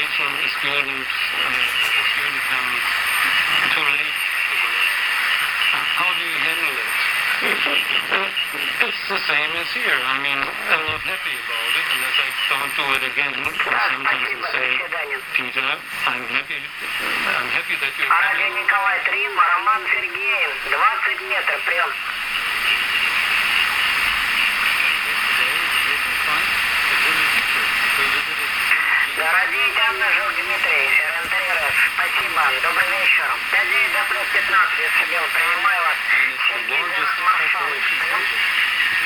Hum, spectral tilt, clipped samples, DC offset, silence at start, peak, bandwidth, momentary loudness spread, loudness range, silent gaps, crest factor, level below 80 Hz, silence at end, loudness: none; -0.5 dB/octave; under 0.1%; under 0.1%; 0 s; 0 dBFS; 17.5 kHz; 5 LU; 3 LU; none; 18 dB; -54 dBFS; 0 s; -18 LUFS